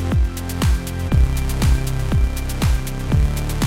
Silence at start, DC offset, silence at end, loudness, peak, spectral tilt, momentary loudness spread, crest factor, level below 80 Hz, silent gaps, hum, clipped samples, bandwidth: 0 s; under 0.1%; 0 s; -20 LUFS; -6 dBFS; -6 dB/octave; 4 LU; 12 dB; -20 dBFS; none; none; under 0.1%; 16.5 kHz